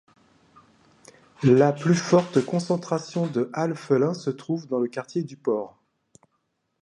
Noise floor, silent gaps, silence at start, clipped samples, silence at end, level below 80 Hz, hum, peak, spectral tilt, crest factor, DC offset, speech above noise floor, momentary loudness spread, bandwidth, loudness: -74 dBFS; none; 1.4 s; under 0.1%; 1.15 s; -68 dBFS; none; -6 dBFS; -7 dB/octave; 20 dB; under 0.1%; 51 dB; 11 LU; 11.5 kHz; -24 LUFS